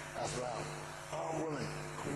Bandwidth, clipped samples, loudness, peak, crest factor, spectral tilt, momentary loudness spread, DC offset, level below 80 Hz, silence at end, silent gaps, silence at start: 13 kHz; under 0.1%; -41 LUFS; -26 dBFS; 14 dB; -4.5 dB/octave; 5 LU; under 0.1%; -62 dBFS; 0 s; none; 0 s